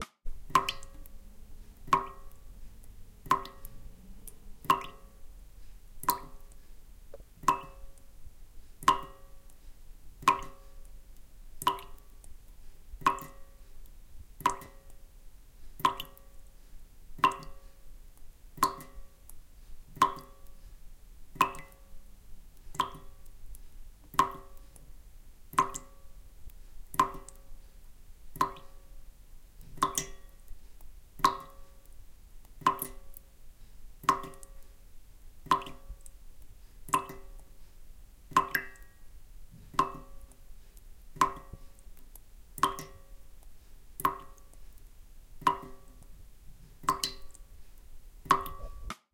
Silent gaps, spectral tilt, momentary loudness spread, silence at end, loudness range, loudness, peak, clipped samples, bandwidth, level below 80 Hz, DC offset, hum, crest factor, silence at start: none; -2.5 dB/octave; 26 LU; 0.15 s; 3 LU; -32 LUFS; -6 dBFS; under 0.1%; 17 kHz; -50 dBFS; under 0.1%; none; 30 dB; 0 s